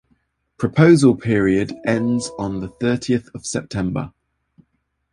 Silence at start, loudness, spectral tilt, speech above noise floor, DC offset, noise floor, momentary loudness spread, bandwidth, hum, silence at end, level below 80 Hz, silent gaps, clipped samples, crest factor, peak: 0.6 s; -19 LUFS; -6.5 dB/octave; 51 dB; under 0.1%; -69 dBFS; 14 LU; 11.5 kHz; none; 1.05 s; -48 dBFS; none; under 0.1%; 18 dB; -2 dBFS